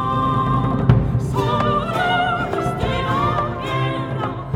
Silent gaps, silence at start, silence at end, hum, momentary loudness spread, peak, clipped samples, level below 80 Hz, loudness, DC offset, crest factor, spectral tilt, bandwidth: none; 0 s; 0 s; none; 6 LU; 0 dBFS; under 0.1%; -34 dBFS; -20 LUFS; under 0.1%; 18 dB; -7 dB/octave; 12 kHz